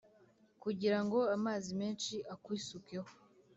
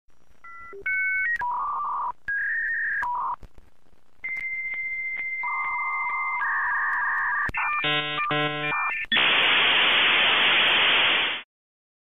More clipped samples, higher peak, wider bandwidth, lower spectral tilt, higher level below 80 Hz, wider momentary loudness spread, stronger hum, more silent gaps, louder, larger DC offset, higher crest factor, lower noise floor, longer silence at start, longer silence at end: neither; second, -22 dBFS vs -10 dBFS; second, 8 kHz vs 14.5 kHz; about the same, -5 dB/octave vs -4 dB/octave; second, -78 dBFS vs -56 dBFS; about the same, 13 LU vs 11 LU; neither; neither; second, -38 LUFS vs -22 LUFS; second, under 0.1% vs 0.6%; about the same, 18 dB vs 16 dB; first, -68 dBFS vs -62 dBFS; first, 0.65 s vs 0.05 s; second, 0.45 s vs 0.6 s